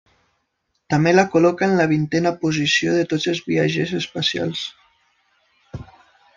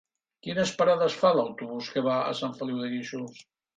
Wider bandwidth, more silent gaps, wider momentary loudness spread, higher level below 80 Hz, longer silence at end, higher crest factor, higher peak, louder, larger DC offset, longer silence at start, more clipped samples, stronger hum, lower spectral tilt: second, 7.6 kHz vs 9.2 kHz; neither; about the same, 15 LU vs 14 LU; first, -56 dBFS vs -70 dBFS; first, 0.55 s vs 0.35 s; about the same, 18 dB vs 18 dB; first, -2 dBFS vs -10 dBFS; first, -19 LUFS vs -27 LUFS; neither; first, 0.9 s vs 0.45 s; neither; neither; about the same, -5 dB/octave vs -5 dB/octave